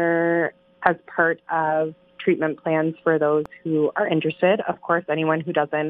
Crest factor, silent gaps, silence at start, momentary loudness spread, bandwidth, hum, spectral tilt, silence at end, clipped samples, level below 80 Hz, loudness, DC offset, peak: 22 dB; none; 0 s; 4 LU; 4.1 kHz; none; -9 dB/octave; 0 s; under 0.1%; -68 dBFS; -22 LUFS; under 0.1%; 0 dBFS